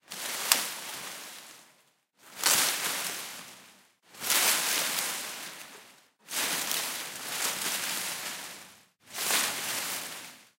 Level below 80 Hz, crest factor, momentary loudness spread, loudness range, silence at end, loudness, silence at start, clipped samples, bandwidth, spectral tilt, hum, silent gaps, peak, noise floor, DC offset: -82 dBFS; 32 dB; 19 LU; 4 LU; 0.15 s; -29 LUFS; 0.1 s; under 0.1%; 16 kHz; 1 dB/octave; none; none; -2 dBFS; -66 dBFS; under 0.1%